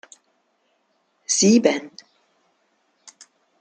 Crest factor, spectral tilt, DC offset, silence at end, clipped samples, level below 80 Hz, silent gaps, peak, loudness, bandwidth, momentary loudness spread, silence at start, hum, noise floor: 22 dB; -3.5 dB/octave; under 0.1%; 1.7 s; under 0.1%; -70 dBFS; none; -2 dBFS; -18 LUFS; 9.6 kHz; 24 LU; 1.3 s; none; -68 dBFS